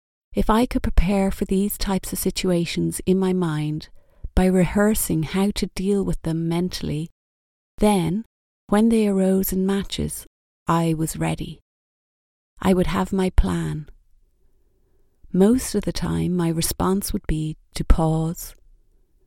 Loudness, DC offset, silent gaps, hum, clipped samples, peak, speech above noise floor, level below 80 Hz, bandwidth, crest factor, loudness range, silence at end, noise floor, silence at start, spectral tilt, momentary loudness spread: -22 LUFS; under 0.1%; 7.12-7.78 s, 8.26-8.68 s, 10.27-10.66 s, 11.62-12.57 s; none; under 0.1%; 0 dBFS; 39 dB; -30 dBFS; 17 kHz; 22 dB; 3 LU; 0.75 s; -60 dBFS; 0.3 s; -6 dB/octave; 10 LU